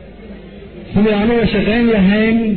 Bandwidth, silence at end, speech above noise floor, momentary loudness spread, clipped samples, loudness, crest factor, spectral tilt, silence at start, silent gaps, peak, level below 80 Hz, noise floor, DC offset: 4.5 kHz; 0 s; 21 dB; 22 LU; under 0.1%; -13 LUFS; 10 dB; -10.5 dB/octave; 0 s; none; -4 dBFS; -32 dBFS; -34 dBFS; under 0.1%